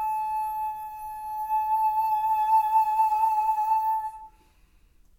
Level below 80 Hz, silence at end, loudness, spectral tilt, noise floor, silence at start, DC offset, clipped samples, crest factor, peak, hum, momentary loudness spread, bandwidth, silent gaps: -60 dBFS; 0.9 s; -25 LUFS; -1.5 dB/octave; -59 dBFS; 0 s; under 0.1%; under 0.1%; 12 dB; -14 dBFS; none; 12 LU; 17 kHz; none